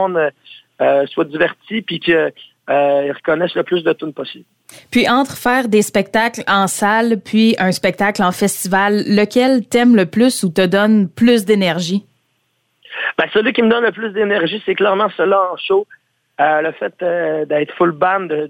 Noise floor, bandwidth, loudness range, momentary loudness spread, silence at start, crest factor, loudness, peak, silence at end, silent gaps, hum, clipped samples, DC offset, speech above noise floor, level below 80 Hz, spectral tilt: -65 dBFS; 17.5 kHz; 4 LU; 7 LU; 0 s; 14 dB; -15 LUFS; -2 dBFS; 0 s; none; none; under 0.1%; under 0.1%; 50 dB; -56 dBFS; -4.5 dB/octave